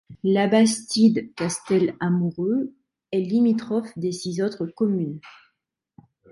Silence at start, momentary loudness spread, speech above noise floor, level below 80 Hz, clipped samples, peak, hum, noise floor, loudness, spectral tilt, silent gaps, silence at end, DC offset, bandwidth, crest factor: 0.1 s; 9 LU; 56 dB; -66 dBFS; under 0.1%; -6 dBFS; none; -78 dBFS; -23 LUFS; -5.5 dB/octave; none; 1 s; under 0.1%; 11.5 kHz; 16 dB